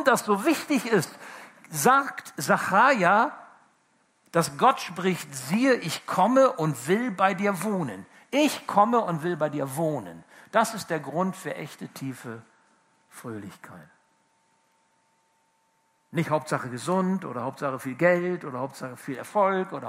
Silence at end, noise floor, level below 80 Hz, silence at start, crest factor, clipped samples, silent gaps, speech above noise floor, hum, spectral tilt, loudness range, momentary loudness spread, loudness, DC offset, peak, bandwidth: 0 s; -69 dBFS; -76 dBFS; 0 s; 22 dB; under 0.1%; none; 44 dB; none; -5 dB/octave; 17 LU; 18 LU; -25 LUFS; under 0.1%; -4 dBFS; 16 kHz